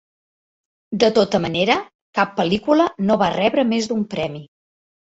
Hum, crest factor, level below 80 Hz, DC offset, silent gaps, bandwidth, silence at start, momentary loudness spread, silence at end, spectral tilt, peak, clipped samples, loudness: none; 18 dB; -54 dBFS; under 0.1%; 1.95-2.13 s; 8 kHz; 0.9 s; 9 LU; 0.6 s; -5.5 dB/octave; -2 dBFS; under 0.1%; -19 LUFS